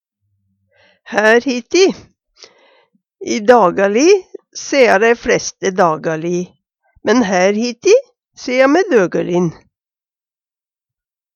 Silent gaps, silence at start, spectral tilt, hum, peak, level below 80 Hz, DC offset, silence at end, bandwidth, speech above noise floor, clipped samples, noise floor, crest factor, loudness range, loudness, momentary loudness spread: none; 1.1 s; -4.5 dB/octave; none; 0 dBFS; -54 dBFS; under 0.1%; 1.8 s; 9 kHz; over 77 dB; under 0.1%; under -90 dBFS; 16 dB; 4 LU; -14 LUFS; 12 LU